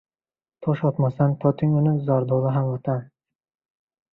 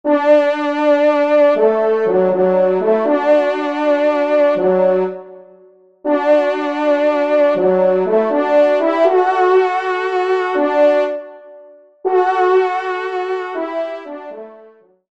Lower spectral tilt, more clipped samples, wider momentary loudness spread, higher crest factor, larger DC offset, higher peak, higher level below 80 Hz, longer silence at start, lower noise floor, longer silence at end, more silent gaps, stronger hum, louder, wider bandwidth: first, -12.5 dB/octave vs -7 dB/octave; neither; about the same, 7 LU vs 9 LU; about the same, 18 dB vs 14 dB; second, under 0.1% vs 0.2%; second, -6 dBFS vs -2 dBFS; first, -60 dBFS vs -70 dBFS; first, 0.6 s vs 0.05 s; first, under -90 dBFS vs -47 dBFS; first, 1.1 s vs 0.55 s; neither; neither; second, -23 LUFS vs -15 LUFS; second, 4.1 kHz vs 7.6 kHz